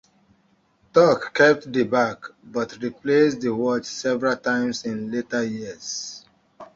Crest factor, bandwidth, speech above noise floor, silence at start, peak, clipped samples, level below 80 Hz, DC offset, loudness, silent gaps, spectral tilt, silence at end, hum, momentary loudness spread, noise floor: 20 dB; 7.8 kHz; 41 dB; 0.95 s; -4 dBFS; under 0.1%; -62 dBFS; under 0.1%; -22 LUFS; none; -4.5 dB/octave; 0.1 s; none; 13 LU; -63 dBFS